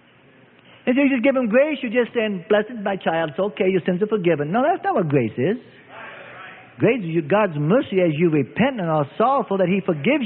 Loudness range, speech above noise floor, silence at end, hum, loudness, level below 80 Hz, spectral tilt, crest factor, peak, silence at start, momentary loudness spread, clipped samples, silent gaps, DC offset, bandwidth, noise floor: 2 LU; 32 dB; 0 s; none; -20 LUFS; -62 dBFS; -12 dB/octave; 16 dB; -4 dBFS; 0.85 s; 9 LU; under 0.1%; none; under 0.1%; 4.2 kHz; -52 dBFS